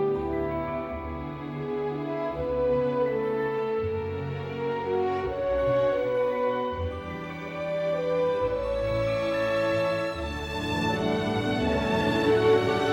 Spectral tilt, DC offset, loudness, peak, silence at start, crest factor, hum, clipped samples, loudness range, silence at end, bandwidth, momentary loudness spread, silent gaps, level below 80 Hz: -6.5 dB/octave; under 0.1%; -27 LUFS; -10 dBFS; 0 s; 16 dB; none; under 0.1%; 3 LU; 0 s; 16 kHz; 9 LU; none; -46 dBFS